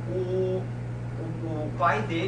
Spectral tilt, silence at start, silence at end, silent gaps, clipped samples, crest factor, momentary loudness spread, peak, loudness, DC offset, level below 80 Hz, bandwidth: -7.5 dB/octave; 0 s; 0 s; none; under 0.1%; 18 dB; 9 LU; -12 dBFS; -29 LUFS; under 0.1%; -48 dBFS; 9.6 kHz